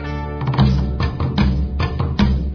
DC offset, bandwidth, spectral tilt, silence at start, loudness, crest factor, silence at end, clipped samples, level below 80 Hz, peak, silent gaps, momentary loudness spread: under 0.1%; 5.4 kHz; -8 dB/octave; 0 s; -19 LUFS; 14 dB; 0 s; under 0.1%; -22 dBFS; -2 dBFS; none; 6 LU